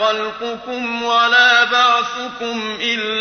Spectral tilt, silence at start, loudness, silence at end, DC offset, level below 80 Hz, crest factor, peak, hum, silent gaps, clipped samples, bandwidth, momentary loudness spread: -1.5 dB/octave; 0 s; -15 LUFS; 0 s; under 0.1%; -60 dBFS; 16 dB; -2 dBFS; none; none; under 0.1%; 6.6 kHz; 13 LU